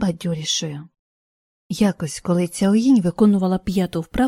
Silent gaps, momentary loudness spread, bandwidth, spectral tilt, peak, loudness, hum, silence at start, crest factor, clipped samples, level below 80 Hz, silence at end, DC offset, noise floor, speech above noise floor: 0.99-1.70 s; 11 LU; 15.5 kHz; -5.5 dB/octave; -4 dBFS; -19 LUFS; none; 0 s; 16 dB; under 0.1%; -44 dBFS; 0 s; under 0.1%; under -90 dBFS; over 71 dB